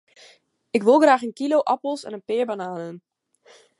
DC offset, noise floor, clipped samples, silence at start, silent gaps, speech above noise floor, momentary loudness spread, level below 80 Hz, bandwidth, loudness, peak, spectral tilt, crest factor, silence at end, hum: under 0.1%; -55 dBFS; under 0.1%; 0.75 s; none; 34 dB; 16 LU; -78 dBFS; 11.5 kHz; -21 LUFS; -4 dBFS; -5 dB/octave; 18 dB; 0.8 s; none